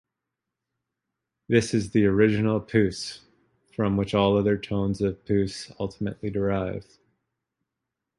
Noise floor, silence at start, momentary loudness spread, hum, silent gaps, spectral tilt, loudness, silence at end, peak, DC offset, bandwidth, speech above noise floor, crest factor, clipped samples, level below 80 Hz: -85 dBFS; 1.5 s; 12 LU; none; none; -6.5 dB/octave; -25 LUFS; 1.35 s; -6 dBFS; under 0.1%; 11.5 kHz; 61 dB; 20 dB; under 0.1%; -50 dBFS